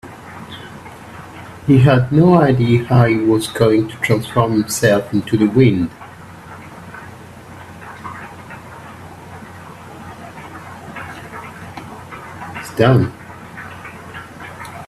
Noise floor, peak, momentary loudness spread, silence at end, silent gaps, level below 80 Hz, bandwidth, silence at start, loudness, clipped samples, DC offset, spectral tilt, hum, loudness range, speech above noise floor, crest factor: -36 dBFS; 0 dBFS; 23 LU; 0 s; none; -46 dBFS; 14 kHz; 0.05 s; -14 LUFS; under 0.1%; under 0.1%; -6.5 dB/octave; none; 20 LU; 23 dB; 18 dB